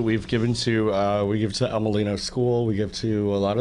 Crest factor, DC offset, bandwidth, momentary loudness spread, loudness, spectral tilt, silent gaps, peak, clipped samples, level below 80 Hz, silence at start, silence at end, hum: 12 dB; under 0.1%; 11 kHz; 3 LU; -24 LUFS; -6 dB/octave; none; -10 dBFS; under 0.1%; -46 dBFS; 0 s; 0 s; none